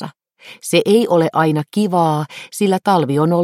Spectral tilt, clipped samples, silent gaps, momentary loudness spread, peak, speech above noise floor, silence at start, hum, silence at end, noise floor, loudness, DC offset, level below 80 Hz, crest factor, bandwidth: -6 dB/octave; under 0.1%; none; 10 LU; -2 dBFS; 27 dB; 0 s; none; 0 s; -43 dBFS; -16 LUFS; under 0.1%; -64 dBFS; 14 dB; 16.5 kHz